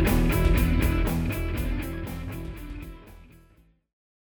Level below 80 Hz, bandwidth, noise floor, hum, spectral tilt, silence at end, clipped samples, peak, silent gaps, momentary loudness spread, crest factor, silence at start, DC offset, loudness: -30 dBFS; over 20 kHz; -59 dBFS; none; -6.5 dB/octave; 0.95 s; under 0.1%; -10 dBFS; none; 18 LU; 16 dB; 0 s; under 0.1%; -27 LUFS